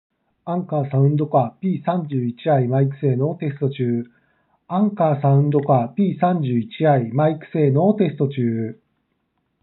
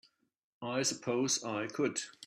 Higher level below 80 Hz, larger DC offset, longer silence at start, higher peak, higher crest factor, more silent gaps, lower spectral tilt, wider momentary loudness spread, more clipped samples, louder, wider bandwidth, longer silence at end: about the same, -76 dBFS vs -80 dBFS; neither; second, 0.45 s vs 0.6 s; first, -4 dBFS vs -20 dBFS; about the same, 16 dB vs 16 dB; neither; first, -8.5 dB/octave vs -3 dB/octave; about the same, 7 LU vs 6 LU; neither; first, -20 LUFS vs -34 LUFS; second, 4.1 kHz vs 14.5 kHz; first, 0.9 s vs 0 s